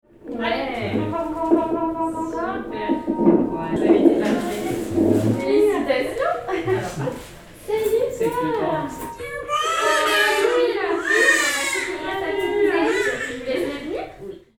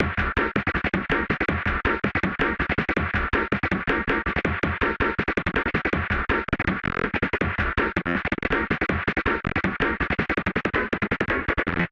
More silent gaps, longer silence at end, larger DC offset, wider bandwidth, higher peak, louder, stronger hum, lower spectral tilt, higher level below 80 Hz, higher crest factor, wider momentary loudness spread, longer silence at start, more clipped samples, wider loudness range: neither; first, 0.2 s vs 0.05 s; neither; first, 20 kHz vs 7.8 kHz; about the same, -2 dBFS vs -4 dBFS; first, -21 LUFS vs -24 LUFS; neither; second, -4.5 dB/octave vs -7.5 dB/octave; second, -48 dBFS vs -36 dBFS; about the same, 20 dB vs 20 dB; first, 12 LU vs 2 LU; first, 0.25 s vs 0 s; neither; first, 5 LU vs 1 LU